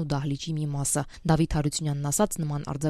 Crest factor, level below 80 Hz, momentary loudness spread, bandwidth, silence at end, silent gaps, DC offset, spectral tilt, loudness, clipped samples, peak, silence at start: 18 dB; -42 dBFS; 6 LU; 15.5 kHz; 0 s; none; under 0.1%; -5 dB/octave; -27 LUFS; under 0.1%; -8 dBFS; 0 s